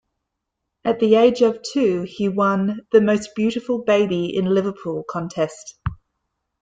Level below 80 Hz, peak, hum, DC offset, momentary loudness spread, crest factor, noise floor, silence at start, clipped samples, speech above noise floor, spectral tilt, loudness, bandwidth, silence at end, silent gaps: -50 dBFS; -2 dBFS; none; under 0.1%; 12 LU; 18 dB; -79 dBFS; 0.85 s; under 0.1%; 60 dB; -6.5 dB/octave; -20 LUFS; 9.2 kHz; 0.65 s; none